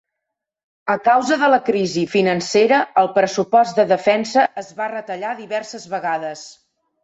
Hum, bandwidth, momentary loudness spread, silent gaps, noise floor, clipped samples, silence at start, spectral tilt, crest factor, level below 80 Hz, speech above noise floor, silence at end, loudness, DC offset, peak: none; 8.2 kHz; 11 LU; none; -81 dBFS; under 0.1%; 0.85 s; -4.5 dB/octave; 16 dB; -64 dBFS; 64 dB; 0.5 s; -18 LUFS; under 0.1%; -4 dBFS